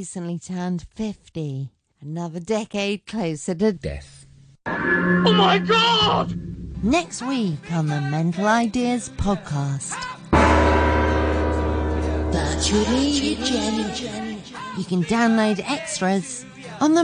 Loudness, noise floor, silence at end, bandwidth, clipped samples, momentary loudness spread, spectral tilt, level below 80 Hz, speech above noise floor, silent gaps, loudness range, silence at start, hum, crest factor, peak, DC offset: -22 LUFS; -49 dBFS; 0 s; 10 kHz; under 0.1%; 15 LU; -5 dB/octave; -32 dBFS; 27 dB; none; 7 LU; 0 s; none; 18 dB; -4 dBFS; under 0.1%